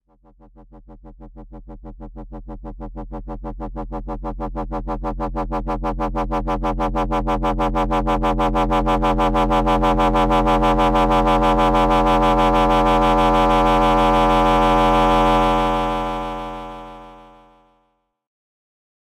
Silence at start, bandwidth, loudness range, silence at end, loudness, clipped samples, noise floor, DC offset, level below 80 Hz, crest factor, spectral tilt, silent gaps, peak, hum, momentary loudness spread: 0.6 s; 13.5 kHz; 17 LU; 1.95 s; -18 LUFS; under 0.1%; -67 dBFS; under 0.1%; -28 dBFS; 10 dB; -6.5 dB/octave; none; -8 dBFS; none; 18 LU